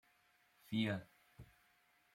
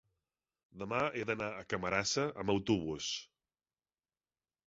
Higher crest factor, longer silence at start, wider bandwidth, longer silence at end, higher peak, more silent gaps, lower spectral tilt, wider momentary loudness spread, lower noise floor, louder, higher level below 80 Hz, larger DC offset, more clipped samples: about the same, 20 dB vs 22 dB; about the same, 0.7 s vs 0.75 s; first, 16.5 kHz vs 7.6 kHz; second, 0.7 s vs 1.4 s; second, -26 dBFS vs -16 dBFS; neither; first, -6.5 dB/octave vs -3.5 dB/octave; first, 24 LU vs 6 LU; second, -75 dBFS vs under -90 dBFS; second, -42 LUFS vs -36 LUFS; second, -76 dBFS vs -64 dBFS; neither; neither